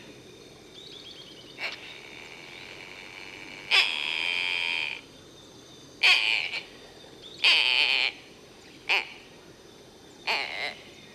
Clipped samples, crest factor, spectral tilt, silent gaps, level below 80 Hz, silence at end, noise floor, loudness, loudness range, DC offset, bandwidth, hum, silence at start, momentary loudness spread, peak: under 0.1%; 22 dB; 0 dB/octave; none; -70 dBFS; 0 s; -51 dBFS; -24 LUFS; 9 LU; under 0.1%; 14 kHz; none; 0 s; 25 LU; -8 dBFS